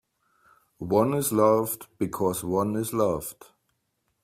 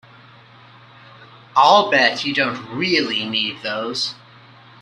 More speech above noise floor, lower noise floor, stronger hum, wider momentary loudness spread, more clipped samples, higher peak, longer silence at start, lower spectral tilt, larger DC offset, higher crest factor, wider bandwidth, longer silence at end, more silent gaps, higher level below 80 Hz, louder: first, 51 dB vs 28 dB; first, -76 dBFS vs -46 dBFS; neither; about the same, 11 LU vs 11 LU; neither; second, -8 dBFS vs 0 dBFS; second, 0.8 s vs 1.2 s; first, -6 dB/octave vs -3.5 dB/octave; neither; about the same, 20 dB vs 20 dB; first, 16 kHz vs 11.5 kHz; first, 0.9 s vs 0.7 s; neither; first, -60 dBFS vs -66 dBFS; second, -25 LUFS vs -18 LUFS